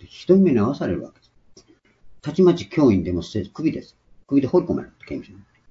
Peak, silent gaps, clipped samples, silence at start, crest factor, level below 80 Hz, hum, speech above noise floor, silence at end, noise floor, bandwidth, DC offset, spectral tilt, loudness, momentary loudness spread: -4 dBFS; none; under 0.1%; 0.05 s; 18 dB; -52 dBFS; none; 34 dB; 0.4 s; -54 dBFS; 7.6 kHz; under 0.1%; -8.5 dB/octave; -20 LUFS; 17 LU